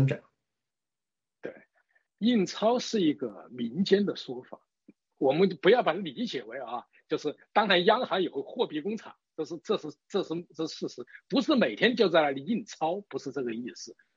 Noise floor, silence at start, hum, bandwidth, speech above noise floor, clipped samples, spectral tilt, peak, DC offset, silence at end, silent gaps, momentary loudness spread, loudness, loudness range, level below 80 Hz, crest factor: under -90 dBFS; 0 s; none; 7.6 kHz; over 62 dB; under 0.1%; -5.5 dB/octave; -8 dBFS; under 0.1%; 0.25 s; none; 16 LU; -29 LUFS; 4 LU; -80 dBFS; 22 dB